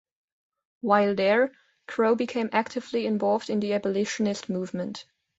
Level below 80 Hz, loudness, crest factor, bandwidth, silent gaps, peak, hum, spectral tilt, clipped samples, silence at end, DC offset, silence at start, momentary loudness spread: -70 dBFS; -26 LUFS; 20 dB; 8 kHz; none; -6 dBFS; none; -5.5 dB/octave; under 0.1%; 0.35 s; under 0.1%; 0.85 s; 11 LU